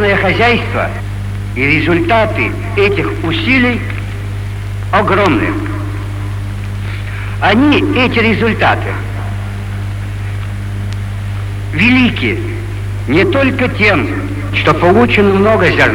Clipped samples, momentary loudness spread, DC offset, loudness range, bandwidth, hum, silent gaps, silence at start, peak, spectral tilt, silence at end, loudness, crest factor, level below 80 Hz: under 0.1%; 12 LU; under 0.1%; 4 LU; 12.5 kHz; 50 Hz at -20 dBFS; none; 0 s; 0 dBFS; -7 dB/octave; 0 s; -13 LUFS; 12 dB; -26 dBFS